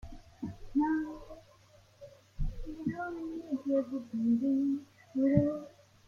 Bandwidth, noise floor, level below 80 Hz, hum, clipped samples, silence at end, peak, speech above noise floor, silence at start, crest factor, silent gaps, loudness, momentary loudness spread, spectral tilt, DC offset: 7 kHz; -61 dBFS; -48 dBFS; none; under 0.1%; 0.4 s; -12 dBFS; 30 dB; 0.05 s; 22 dB; none; -33 LUFS; 20 LU; -9 dB/octave; under 0.1%